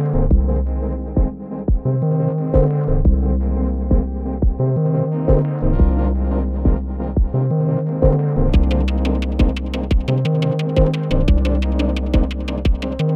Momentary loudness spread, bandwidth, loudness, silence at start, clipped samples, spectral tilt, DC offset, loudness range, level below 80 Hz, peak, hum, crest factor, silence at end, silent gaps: 4 LU; 6.4 kHz; -19 LUFS; 0 s; under 0.1%; -9 dB/octave; under 0.1%; 1 LU; -20 dBFS; -2 dBFS; none; 14 dB; 0 s; none